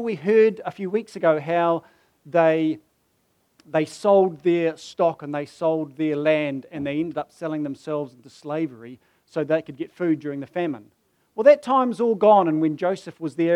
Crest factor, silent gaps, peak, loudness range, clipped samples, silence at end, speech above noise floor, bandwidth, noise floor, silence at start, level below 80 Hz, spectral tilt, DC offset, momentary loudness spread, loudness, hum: 18 dB; none; -4 dBFS; 8 LU; under 0.1%; 0 s; 46 dB; 11 kHz; -67 dBFS; 0 s; -72 dBFS; -7 dB/octave; under 0.1%; 13 LU; -22 LUFS; none